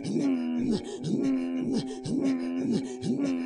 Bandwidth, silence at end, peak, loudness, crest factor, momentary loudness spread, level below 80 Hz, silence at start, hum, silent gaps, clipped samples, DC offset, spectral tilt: 10.5 kHz; 0 s; -16 dBFS; -29 LUFS; 12 dB; 4 LU; -60 dBFS; 0 s; none; none; under 0.1%; under 0.1%; -6.5 dB/octave